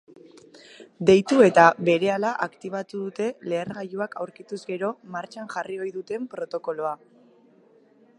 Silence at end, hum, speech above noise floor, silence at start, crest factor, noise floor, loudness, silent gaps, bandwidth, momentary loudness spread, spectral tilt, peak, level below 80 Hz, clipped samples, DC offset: 1.25 s; none; 34 dB; 0.55 s; 24 dB; -57 dBFS; -24 LUFS; none; 11 kHz; 17 LU; -6 dB/octave; -2 dBFS; -66 dBFS; under 0.1%; under 0.1%